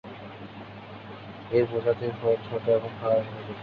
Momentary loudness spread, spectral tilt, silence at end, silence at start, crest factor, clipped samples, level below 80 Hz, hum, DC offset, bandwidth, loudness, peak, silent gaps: 16 LU; -9 dB/octave; 0 s; 0.05 s; 18 dB; under 0.1%; -60 dBFS; none; under 0.1%; 5.2 kHz; -27 LUFS; -10 dBFS; none